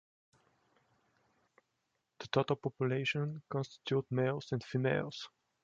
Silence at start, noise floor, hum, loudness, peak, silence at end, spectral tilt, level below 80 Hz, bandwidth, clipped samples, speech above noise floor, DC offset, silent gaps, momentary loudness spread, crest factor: 2.2 s; -83 dBFS; none; -36 LUFS; -16 dBFS; 0.35 s; -6.5 dB/octave; -74 dBFS; 7.6 kHz; under 0.1%; 48 dB; under 0.1%; none; 9 LU; 22 dB